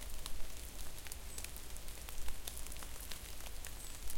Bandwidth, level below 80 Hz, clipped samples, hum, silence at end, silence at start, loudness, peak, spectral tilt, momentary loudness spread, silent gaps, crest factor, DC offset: 17 kHz; -48 dBFS; under 0.1%; none; 0 s; 0 s; -48 LUFS; -22 dBFS; -2 dB/octave; 3 LU; none; 18 dB; under 0.1%